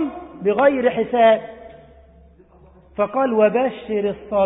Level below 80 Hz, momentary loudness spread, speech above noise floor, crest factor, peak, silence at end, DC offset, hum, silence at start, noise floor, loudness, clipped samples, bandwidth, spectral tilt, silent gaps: -52 dBFS; 9 LU; 32 dB; 16 dB; -4 dBFS; 0 s; under 0.1%; none; 0 s; -49 dBFS; -19 LUFS; under 0.1%; 4 kHz; -10.5 dB/octave; none